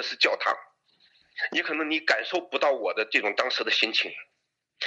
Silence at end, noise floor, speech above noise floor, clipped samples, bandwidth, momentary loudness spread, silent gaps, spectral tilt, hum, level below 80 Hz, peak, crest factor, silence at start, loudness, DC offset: 0 s; -77 dBFS; 51 dB; under 0.1%; 9 kHz; 10 LU; none; -1 dB/octave; none; -84 dBFS; -6 dBFS; 22 dB; 0 s; -25 LUFS; under 0.1%